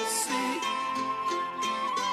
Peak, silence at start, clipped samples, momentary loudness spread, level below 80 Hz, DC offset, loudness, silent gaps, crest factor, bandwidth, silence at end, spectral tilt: -18 dBFS; 0 s; under 0.1%; 3 LU; -72 dBFS; under 0.1%; -29 LUFS; none; 12 dB; 13.5 kHz; 0 s; -1 dB/octave